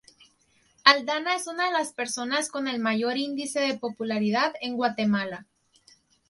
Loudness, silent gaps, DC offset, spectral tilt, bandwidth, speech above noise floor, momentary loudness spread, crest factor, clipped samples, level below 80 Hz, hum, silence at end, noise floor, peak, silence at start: -26 LUFS; none; under 0.1%; -3 dB/octave; 11.5 kHz; 39 dB; 10 LU; 26 dB; under 0.1%; -74 dBFS; none; 0.85 s; -65 dBFS; 0 dBFS; 0.85 s